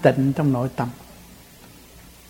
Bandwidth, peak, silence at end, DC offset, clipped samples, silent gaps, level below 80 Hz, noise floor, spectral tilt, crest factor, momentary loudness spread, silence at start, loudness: 17 kHz; 0 dBFS; 0.95 s; under 0.1%; under 0.1%; none; -52 dBFS; -46 dBFS; -8 dB/octave; 22 dB; 25 LU; 0 s; -22 LUFS